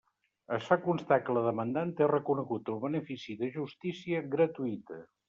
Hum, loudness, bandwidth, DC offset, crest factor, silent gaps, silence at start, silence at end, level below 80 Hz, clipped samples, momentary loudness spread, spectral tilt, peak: none; -32 LUFS; 7.4 kHz; under 0.1%; 20 dB; none; 0.5 s; 0.25 s; -76 dBFS; under 0.1%; 9 LU; -6 dB/octave; -12 dBFS